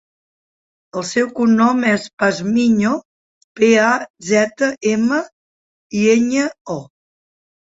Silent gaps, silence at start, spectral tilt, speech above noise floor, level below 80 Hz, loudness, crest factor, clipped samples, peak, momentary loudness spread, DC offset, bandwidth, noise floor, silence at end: 2.13-2.17 s, 3.05-3.55 s, 4.10-4.14 s, 5.32-5.90 s, 6.61-6.65 s; 0.95 s; -5 dB/octave; over 74 dB; -60 dBFS; -16 LUFS; 16 dB; under 0.1%; -2 dBFS; 12 LU; under 0.1%; 8 kHz; under -90 dBFS; 0.9 s